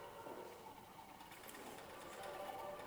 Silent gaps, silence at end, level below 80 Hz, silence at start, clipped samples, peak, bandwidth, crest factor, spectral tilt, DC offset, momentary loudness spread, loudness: none; 0 s; -76 dBFS; 0 s; under 0.1%; -34 dBFS; over 20 kHz; 18 dB; -3.5 dB/octave; under 0.1%; 8 LU; -53 LUFS